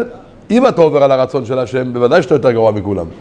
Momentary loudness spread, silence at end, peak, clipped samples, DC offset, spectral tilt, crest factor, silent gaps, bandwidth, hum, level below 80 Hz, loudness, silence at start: 8 LU; 0 s; 0 dBFS; 0.1%; under 0.1%; -7 dB/octave; 12 dB; none; 9.6 kHz; none; -46 dBFS; -13 LUFS; 0 s